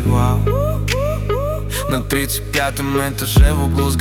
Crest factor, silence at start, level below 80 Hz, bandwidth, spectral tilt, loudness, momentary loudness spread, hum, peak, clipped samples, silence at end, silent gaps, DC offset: 14 dB; 0 s; -22 dBFS; 18 kHz; -5.5 dB/octave; -18 LUFS; 6 LU; none; -2 dBFS; under 0.1%; 0 s; none; under 0.1%